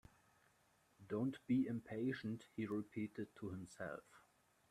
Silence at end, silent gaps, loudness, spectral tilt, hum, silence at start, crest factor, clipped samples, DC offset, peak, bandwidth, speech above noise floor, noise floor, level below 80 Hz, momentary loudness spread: 0.55 s; none; -45 LUFS; -7.5 dB/octave; none; 1 s; 18 dB; under 0.1%; under 0.1%; -28 dBFS; 13 kHz; 32 dB; -76 dBFS; -78 dBFS; 11 LU